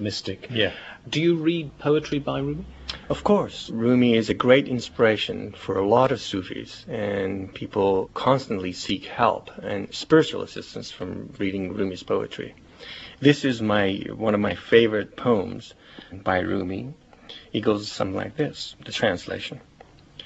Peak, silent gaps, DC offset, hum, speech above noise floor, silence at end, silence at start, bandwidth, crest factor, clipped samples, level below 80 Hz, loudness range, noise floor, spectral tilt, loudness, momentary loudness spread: -2 dBFS; none; under 0.1%; none; 26 dB; 0 s; 0 s; 8.2 kHz; 22 dB; under 0.1%; -52 dBFS; 6 LU; -50 dBFS; -6 dB/octave; -24 LUFS; 16 LU